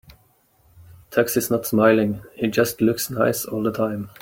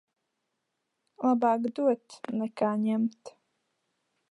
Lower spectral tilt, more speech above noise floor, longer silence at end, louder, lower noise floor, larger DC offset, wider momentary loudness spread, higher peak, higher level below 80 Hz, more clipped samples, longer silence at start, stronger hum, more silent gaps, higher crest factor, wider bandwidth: second, -5 dB/octave vs -7.5 dB/octave; second, 39 dB vs 54 dB; second, 0.15 s vs 1 s; first, -21 LUFS vs -29 LUFS; second, -60 dBFS vs -82 dBFS; neither; about the same, 8 LU vs 8 LU; first, -4 dBFS vs -14 dBFS; first, -56 dBFS vs -84 dBFS; neither; second, 0.8 s vs 1.2 s; neither; neither; about the same, 18 dB vs 18 dB; first, 17 kHz vs 11 kHz